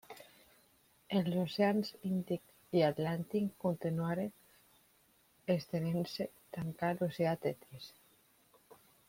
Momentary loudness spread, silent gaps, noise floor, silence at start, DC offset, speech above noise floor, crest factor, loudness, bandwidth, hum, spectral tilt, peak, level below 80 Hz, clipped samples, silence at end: 13 LU; none; -70 dBFS; 0.1 s; under 0.1%; 35 dB; 20 dB; -36 LUFS; 16.5 kHz; none; -7 dB/octave; -18 dBFS; -72 dBFS; under 0.1%; 1.2 s